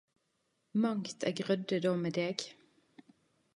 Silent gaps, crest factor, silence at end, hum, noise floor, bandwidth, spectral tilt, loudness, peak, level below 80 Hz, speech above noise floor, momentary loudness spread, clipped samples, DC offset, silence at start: none; 24 dB; 1.05 s; none; -79 dBFS; 11.5 kHz; -5.5 dB/octave; -34 LUFS; -12 dBFS; -82 dBFS; 46 dB; 6 LU; under 0.1%; under 0.1%; 0.75 s